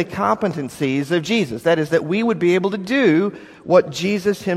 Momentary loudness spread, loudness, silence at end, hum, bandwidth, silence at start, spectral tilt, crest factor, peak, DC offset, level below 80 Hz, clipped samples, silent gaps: 6 LU; -19 LUFS; 0 s; none; 14.5 kHz; 0 s; -6 dB/octave; 18 dB; 0 dBFS; under 0.1%; -58 dBFS; under 0.1%; none